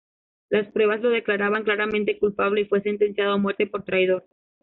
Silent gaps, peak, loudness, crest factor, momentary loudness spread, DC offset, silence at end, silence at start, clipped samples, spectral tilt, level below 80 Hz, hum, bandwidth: none; -8 dBFS; -23 LUFS; 14 dB; 3 LU; under 0.1%; 0.45 s; 0.5 s; under 0.1%; -3.5 dB/octave; -62 dBFS; none; 4.1 kHz